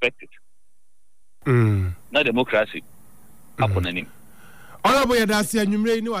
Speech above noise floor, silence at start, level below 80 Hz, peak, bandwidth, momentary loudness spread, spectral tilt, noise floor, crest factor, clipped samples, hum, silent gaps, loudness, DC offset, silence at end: 51 dB; 0 s; -48 dBFS; -8 dBFS; 16 kHz; 12 LU; -5.5 dB/octave; -72 dBFS; 14 dB; under 0.1%; none; none; -21 LUFS; 0.8%; 0 s